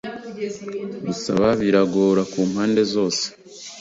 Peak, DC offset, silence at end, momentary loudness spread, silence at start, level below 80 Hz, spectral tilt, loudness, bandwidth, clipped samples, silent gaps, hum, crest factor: -4 dBFS; under 0.1%; 0 s; 13 LU; 0.05 s; -54 dBFS; -5 dB/octave; -21 LUFS; 7.8 kHz; under 0.1%; none; none; 18 dB